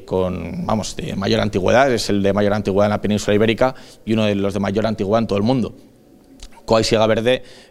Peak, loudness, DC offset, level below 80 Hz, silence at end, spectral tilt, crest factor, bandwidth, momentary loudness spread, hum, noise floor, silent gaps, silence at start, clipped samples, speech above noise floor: 0 dBFS; -18 LUFS; under 0.1%; -40 dBFS; 0.1 s; -5.5 dB/octave; 18 dB; 15 kHz; 8 LU; none; -47 dBFS; none; 0 s; under 0.1%; 29 dB